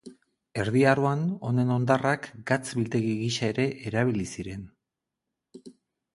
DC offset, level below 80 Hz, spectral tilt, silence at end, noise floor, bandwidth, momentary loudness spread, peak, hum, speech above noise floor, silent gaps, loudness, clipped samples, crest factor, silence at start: under 0.1%; -58 dBFS; -6 dB/octave; 0.45 s; -86 dBFS; 11.5 kHz; 12 LU; -6 dBFS; none; 60 dB; none; -26 LUFS; under 0.1%; 20 dB; 0.05 s